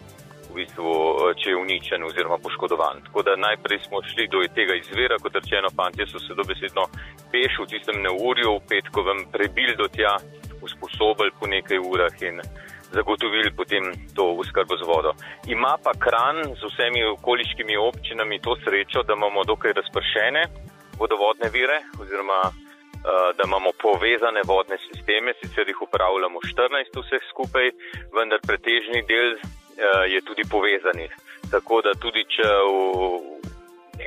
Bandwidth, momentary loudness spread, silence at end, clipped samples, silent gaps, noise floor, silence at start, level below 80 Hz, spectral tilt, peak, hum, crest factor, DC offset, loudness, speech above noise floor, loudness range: 15.5 kHz; 9 LU; 0 s; under 0.1%; none; -44 dBFS; 0 s; -48 dBFS; -4.5 dB/octave; -8 dBFS; none; 16 dB; under 0.1%; -22 LUFS; 21 dB; 2 LU